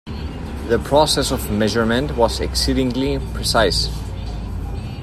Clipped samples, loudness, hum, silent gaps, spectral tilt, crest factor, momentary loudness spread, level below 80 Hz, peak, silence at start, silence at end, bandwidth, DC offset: under 0.1%; -19 LUFS; none; none; -4.5 dB/octave; 18 dB; 13 LU; -28 dBFS; -2 dBFS; 0.05 s; 0 s; 15.5 kHz; under 0.1%